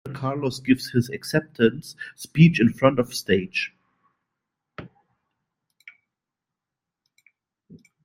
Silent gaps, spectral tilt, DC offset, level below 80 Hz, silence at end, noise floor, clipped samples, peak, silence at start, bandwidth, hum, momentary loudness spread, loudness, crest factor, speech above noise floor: none; -6.5 dB/octave; under 0.1%; -56 dBFS; 3.15 s; -87 dBFS; under 0.1%; -2 dBFS; 0.05 s; 16 kHz; none; 20 LU; -22 LUFS; 22 dB; 65 dB